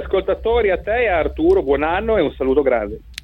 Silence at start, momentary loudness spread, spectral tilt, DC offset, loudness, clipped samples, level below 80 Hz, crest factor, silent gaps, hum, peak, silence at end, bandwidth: 0 s; 3 LU; -7 dB/octave; under 0.1%; -18 LUFS; under 0.1%; -32 dBFS; 14 dB; none; none; -4 dBFS; 0.1 s; 9.2 kHz